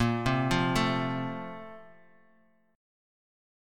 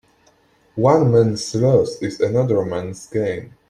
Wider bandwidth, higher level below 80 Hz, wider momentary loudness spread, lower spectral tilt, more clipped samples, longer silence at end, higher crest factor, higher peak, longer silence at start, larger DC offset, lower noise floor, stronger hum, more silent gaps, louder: first, 16 kHz vs 11 kHz; about the same, -50 dBFS vs -54 dBFS; first, 17 LU vs 11 LU; about the same, -6 dB/octave vs -7 dB/octave; neither; first, 1.85 s vs 0.2 s; about the same, 20 dB vs 16 dB; second, -12 dBFS vs -2 dBFS; second, 0 s vs 0.75 s; neither; first, -66 dBFS vs -57 dBFS; neither; neither; second, -29 LUFS vs -18 LUFS